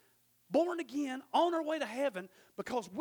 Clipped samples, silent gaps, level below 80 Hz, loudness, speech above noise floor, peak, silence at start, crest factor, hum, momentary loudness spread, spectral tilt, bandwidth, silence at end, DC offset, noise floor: under 0.1%; none; -80 dBFS; -35 LUFS; 36 dB; -18 dBFS; 0.5 s; 18 dB; none; 12 LU; -4.5 dB/octave; over 20 kHz; 0 s; under 0.1%; -70 dBFS